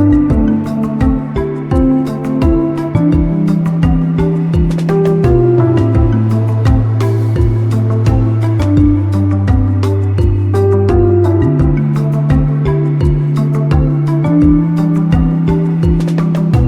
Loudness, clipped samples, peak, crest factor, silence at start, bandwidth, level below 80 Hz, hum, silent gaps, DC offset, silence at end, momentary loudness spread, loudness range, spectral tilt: -12 LUFS; under 0.1%; 0 dBFS; 10 dB; 0 s; 9.8 kHz; -22 dBFS; none; none; under 0.1%; 0 s; 3 LU; 1 LU; -9.5 dB/octave